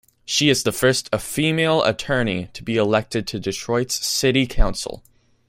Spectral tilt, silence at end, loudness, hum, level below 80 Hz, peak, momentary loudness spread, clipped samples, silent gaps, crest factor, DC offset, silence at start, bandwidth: -4 dB/octave; 0.5 s; -20 LUFS; none; -30 dBFS; -2 dBFS; 8 LU; under 0.1%; none; 20 dB; under 0.1%; 0.3 s; 16.5 kHz